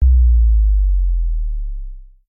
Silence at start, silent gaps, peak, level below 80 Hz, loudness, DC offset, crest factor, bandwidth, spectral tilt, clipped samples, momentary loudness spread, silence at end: 0 s; none; -6 dBFS; -14 dBFS; -17 LUFS; under 0.1%; 8 dB; 0.3 kHz; -14.5 dB/octave; under 0.1%; 18 LU; 0.25 s